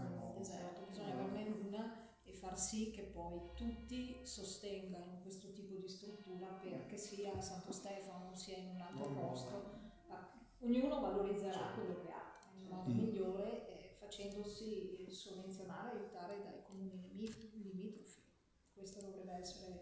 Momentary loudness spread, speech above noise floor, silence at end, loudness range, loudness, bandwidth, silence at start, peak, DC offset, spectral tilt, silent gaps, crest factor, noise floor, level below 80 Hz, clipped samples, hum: 13 LU; 29 dB; 0 s; 7 LU; -47 LUFS; 8 kHz; 0 s; -28 dBFS; under 0.1%; -5 dB/octave; none; 20 dB; -75 dBFS; -66 dBFS; under 0.1%; none